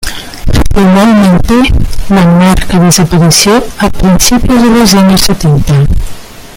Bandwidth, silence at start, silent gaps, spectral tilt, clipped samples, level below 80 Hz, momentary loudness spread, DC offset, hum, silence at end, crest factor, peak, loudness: over 20 kHz; 0 s; none; -5 dB/octave; 0.7%; -16 dBFS; 8 LU; under 0.1%; none; 0 s; 6 dB; 0 dBFS; -6 LUFS